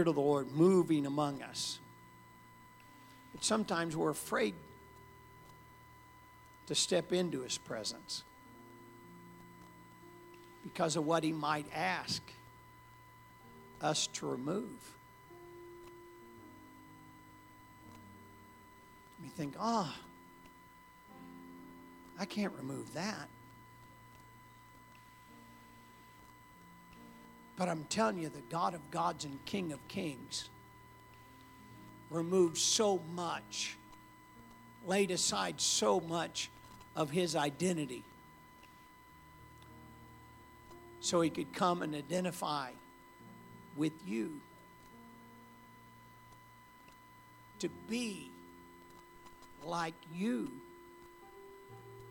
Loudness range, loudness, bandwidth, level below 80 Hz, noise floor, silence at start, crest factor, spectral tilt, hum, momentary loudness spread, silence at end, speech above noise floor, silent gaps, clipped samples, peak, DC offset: 14 LU; -36 LUFS; 19 kHz; -70 dBFS; -59 dBFS; 0 s; 22 dB; -4 dB/octave; none; 25 LU; 0 s; 24 dB; none; under 0.1%; -16 dBFS; under 0.1%